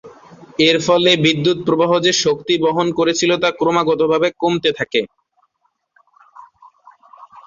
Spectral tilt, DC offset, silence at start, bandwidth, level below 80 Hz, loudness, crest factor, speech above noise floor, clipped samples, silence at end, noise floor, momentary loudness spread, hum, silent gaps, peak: -4 dB/octave; under 0.1%; 0.05 s; 7.6 kHz; -56 dBFS; -15 LUFS; 16 dB; 52 dB; under 0.1%; 0.05 s; -68 dBFS; 6 LU; none; none; -2 dBFS